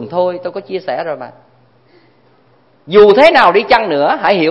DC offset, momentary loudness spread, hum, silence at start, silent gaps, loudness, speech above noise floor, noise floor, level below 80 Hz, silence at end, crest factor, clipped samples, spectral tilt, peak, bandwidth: under 0.1%; 17 LU; none; 0 s; none; -11 LUFS; 40 dB; -51 dBFS; -48 dBFS; 0 s; 12 dB; 0.4%; -6 dB/octave; 0 dBFS; 8.6 kHz